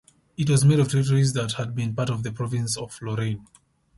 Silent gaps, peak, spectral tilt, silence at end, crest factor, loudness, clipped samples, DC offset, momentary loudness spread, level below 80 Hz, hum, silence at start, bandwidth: none; -8 dBFS; -6 dB/octave; 0.55 s; 16 dB; -24 LUFS; under 0.1%; under 0.1%; 11 LU; -54 dBFS; none; 0.4 s; 11.5 kHz